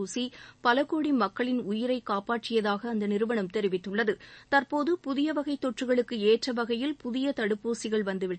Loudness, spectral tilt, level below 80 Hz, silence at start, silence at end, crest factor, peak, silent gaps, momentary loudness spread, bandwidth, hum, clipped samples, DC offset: -29 LUFS; -5 dB/octave; -68 dBFS; 0 s; 0 s; 18 dB; -10 dBFS; none; 5 LU; 8.8 kHz; none; under 0.1%; under 0.1%